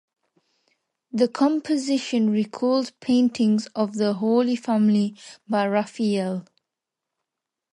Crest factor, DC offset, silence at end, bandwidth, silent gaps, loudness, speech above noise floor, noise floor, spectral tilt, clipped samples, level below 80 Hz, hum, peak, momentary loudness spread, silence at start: 16 dB; under 0.1%; 1.3 s; 10.5 kHz; none; -23 LUFS; 64 dB; -85 dBFS; -6 dB/octave; under 0.1%; -72 dBFS; none; -8 dBFS; 7 LU; 1.15 s